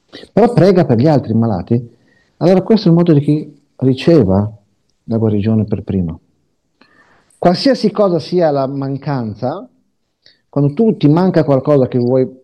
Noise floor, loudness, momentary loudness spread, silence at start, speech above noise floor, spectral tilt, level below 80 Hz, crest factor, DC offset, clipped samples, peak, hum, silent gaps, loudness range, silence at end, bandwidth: -64 dBFS; -14 LUFS; 10 LU; 0.15 s; 51 dB; -9 dB/octave; -50 dBFS; 14 dB; under 0.1%; under 0.1%; 0 dBFS; none; none; 4 LU; 0.1 s; 9.6 kHz